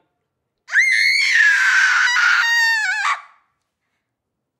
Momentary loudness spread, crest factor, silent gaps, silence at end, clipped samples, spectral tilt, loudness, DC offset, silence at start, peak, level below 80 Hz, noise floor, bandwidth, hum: 7 LU; 14 dB; none; 1.4 s; under 0.1%; 6.5 dB/octave; -14 LUFS; under 0.1%; 0.7 s; -4 dBFS; under -90 dBFS; -77 dBFS; 16 kHz; none